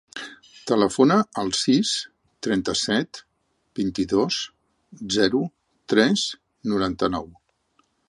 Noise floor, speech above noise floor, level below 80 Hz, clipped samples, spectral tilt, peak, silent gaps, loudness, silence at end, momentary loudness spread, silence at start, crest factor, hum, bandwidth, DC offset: -67 dBFS; 45 dB; -54 dBFS; under 0.1%; -4 dB/octave; -4 dBFS; none; -23 LUFS; 0.8 s; 18 LU; 0.15 s; 20 dB; none; 11.5 kHz; under 0.1%